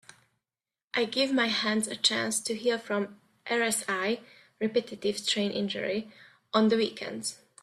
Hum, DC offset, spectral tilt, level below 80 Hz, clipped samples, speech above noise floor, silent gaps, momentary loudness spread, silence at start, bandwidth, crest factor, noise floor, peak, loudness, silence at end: none; under 0.1%; -3 dB/octave; -74 dBFS; under 0.1%; over 61 dB; none; 10 LU; 0.95 s; 14 kHz; 20 dB; under -90 dBFS; -10 dBFS; -29 LUFS; 0.3 s